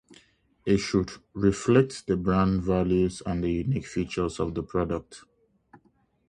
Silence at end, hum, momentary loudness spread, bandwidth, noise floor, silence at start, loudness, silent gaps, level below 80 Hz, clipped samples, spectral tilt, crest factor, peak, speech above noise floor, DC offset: 1.1 s; none; 8 LU; 10.5 kHz; -65 dBFS; 0.65 s; -27 LUFS; none; -44 dBFS; under 0.1%; -7 dB/octave; 20 dB; -8 dBFS; 40 dB; under 0.1%